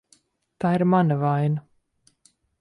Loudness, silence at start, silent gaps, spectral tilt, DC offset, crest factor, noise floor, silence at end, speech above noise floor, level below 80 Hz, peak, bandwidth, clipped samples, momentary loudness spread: -22 LUFS; 0.6 s; none; -9.5 dB/octave; under 0.1%; 16 dB; -65 dBFS; 1 s; 44 dB; -66 dBFS; -8 dBFS; 10.5 kHz; under 0.1%; 8 LU